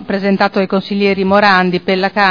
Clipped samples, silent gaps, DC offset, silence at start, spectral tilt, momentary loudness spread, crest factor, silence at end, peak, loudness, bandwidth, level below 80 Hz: 0.2%; none; under 0.1%; 0 s; -7 dB/octave; 6 LU; 12 dB; 0 s; 0 dBFS; -13 LUFS; 5.4 kHz; -52 dBFS